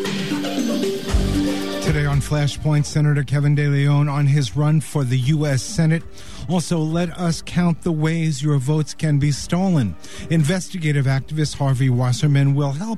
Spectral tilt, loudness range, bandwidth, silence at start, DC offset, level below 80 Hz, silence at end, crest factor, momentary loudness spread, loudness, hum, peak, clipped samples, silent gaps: -6.5 dB/octave; 2 LU; 13.5 kHz; 0 s; 2%; -36 dBFS; 0 s; 12 dB; 5 LU; -20 LUFS; none; -6 dBFS; under 0.1%; none